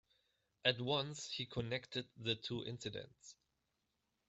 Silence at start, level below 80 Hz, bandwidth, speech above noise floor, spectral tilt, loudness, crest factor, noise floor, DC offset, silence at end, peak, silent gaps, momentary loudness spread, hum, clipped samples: 0.65 s; -72 dBFS; 8.2 kHz; 44 dB; -4 dB/octave; -41 LUFS; 26 dB; -86 dBFS; under 0.1%; 0.95 s; -18 dBFS; none; 15 LU; none; under 0.1%